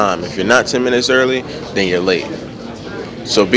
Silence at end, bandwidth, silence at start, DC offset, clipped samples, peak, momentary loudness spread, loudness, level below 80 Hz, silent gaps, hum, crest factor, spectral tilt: 0 s; 8 kHz; 0 s; under 0.1%; 0.2%; 0 dBFS; 15 LU; -15 LUFS; -44 dBFS; none; none; 16 dB; -4 dB/octave